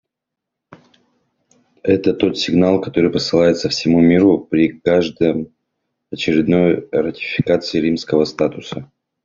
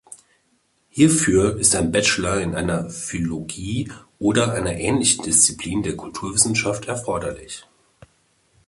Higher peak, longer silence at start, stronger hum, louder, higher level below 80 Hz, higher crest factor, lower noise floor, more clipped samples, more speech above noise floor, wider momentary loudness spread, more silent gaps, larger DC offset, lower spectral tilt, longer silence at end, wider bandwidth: about the same, 0 dBFS vs -2 dBFS; first, 1.85 s vs 0.1 s; neither; first, -16 LUFS vs -20 LUFS; second, -52 dBFS vs -44 dBFS; about the same, 16 dB vs 20 dB; first, -82 dBFS vs -65 dBFS; neither; first, 66 dB vs 44 dB; second, 10 LU vs 14 LU; neither; neither; first, -6.5 dB/octave vs -3.5 dB/octave; second, 0.4 s vs 1.05 s; second, 7.6 kHz vs 12 kHz